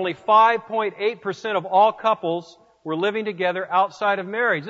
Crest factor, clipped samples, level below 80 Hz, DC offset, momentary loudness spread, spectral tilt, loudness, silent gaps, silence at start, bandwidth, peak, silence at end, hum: 16 dB; under 0.1%; -74 dBFS; under 0.1%; 11 LU; -5.5 dB/octave; -21 LUFS; none; 0 s; 7.8 kHz; -6 dBFS; 0 s; none